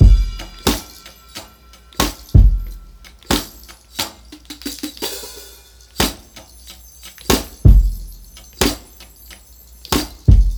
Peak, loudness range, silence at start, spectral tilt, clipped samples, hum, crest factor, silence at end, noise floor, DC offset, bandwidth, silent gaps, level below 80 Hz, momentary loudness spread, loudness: 0 dBFS; 7 LU; 0 s; -5 dB/octave; under 0.1%; none; 18 dB; 0 s; -44 dBFS; under 0.1%; over 20 kHz; none; -20 dBFS; 26 LU; -19 LUFS